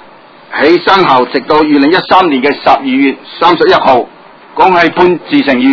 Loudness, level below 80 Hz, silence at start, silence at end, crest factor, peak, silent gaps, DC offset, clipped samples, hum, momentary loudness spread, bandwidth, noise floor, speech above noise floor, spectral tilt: -8 LUFS; -46 dBFS; 0.5 s; 0 s; 8 dB; 0 dBFS; none; under 0.1%; 2%; none; 5 LU; 6 kHz; -36 dBFS; 28 dB; -6.5 dB/octave